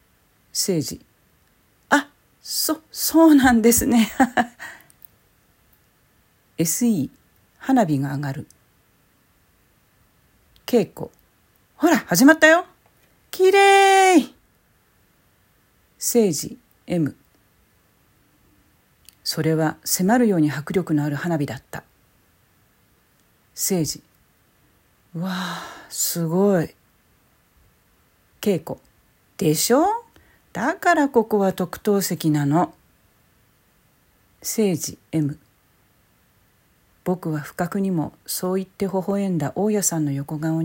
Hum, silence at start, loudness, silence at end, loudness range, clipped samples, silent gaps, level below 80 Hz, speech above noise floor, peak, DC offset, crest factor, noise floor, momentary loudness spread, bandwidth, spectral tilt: none; 0.55 s; -20 LUFS; 0 s; 10 LU; under 0.1%; none; -56 dBFS; 41 dB; 0 dBFS; under 0.1%; 22 dB; -61 dBFS; 19 LU; 16.5 kHz; -4.5 dB/octave